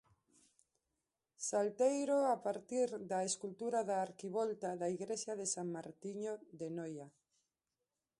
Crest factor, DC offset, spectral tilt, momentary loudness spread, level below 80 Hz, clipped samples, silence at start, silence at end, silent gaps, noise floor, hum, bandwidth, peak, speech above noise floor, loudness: 18 dB; under 0.1%; -4 dB/octave; 12 LU; -86 dBFS; under 0.1%; 1.4 s; 1.1 s; none; under -90 dBFS; none; 11.5 kHz; -22 dBFS; over 51 dB; -39 LUFS